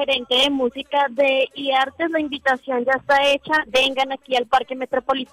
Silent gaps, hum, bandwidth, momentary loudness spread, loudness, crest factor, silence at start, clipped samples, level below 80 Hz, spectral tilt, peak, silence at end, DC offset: none; none; 16 kHz; 6 LU; -20 LUFS; 12 dB; 0 s; under 0.1%; -56 dBFS; -2.5 dB/octave; -8 dBFS; 0.1 s; under 0.1%